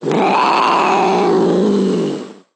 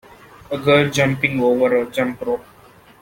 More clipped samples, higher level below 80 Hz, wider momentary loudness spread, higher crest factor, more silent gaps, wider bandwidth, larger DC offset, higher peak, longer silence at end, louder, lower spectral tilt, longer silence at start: neither; second, -60 dBFS vs -52 dBFS; second, 6 LU vs 10 LU; second, 12 dB vs 18 dB; neither; second, 10 kHz vs 17 kHz; neither; about the same, -2 dBFS vs -2 dBFS; second, 0.25 s vs 0.6 s; first, -14 LUFS vs -18 LUFS; about the same, -6 dB/octave vs -5.5 dB/octave; second, 0 s vs 0.5 s